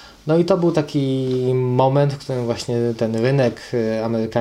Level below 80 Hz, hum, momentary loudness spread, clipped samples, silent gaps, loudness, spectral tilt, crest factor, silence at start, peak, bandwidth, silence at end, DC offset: -54 dBFS; none; 5 LU; under 0.1%; none; -19 LUFS; -7.5 dB/octave; 18 dB; 0 s; -2 dBFS; 12 kHz; 0 s; under 0.1%